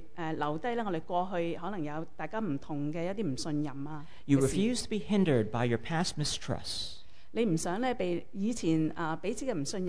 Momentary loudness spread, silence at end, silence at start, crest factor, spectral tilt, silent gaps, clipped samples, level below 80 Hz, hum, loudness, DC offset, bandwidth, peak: 10 LU; 0 s; 0 s; 18 dB; -5.5 dB/octave; none; under 0.1%; -54 dBFS; none; -33 LUFS; 1%; 11 kHz; -14 dBFS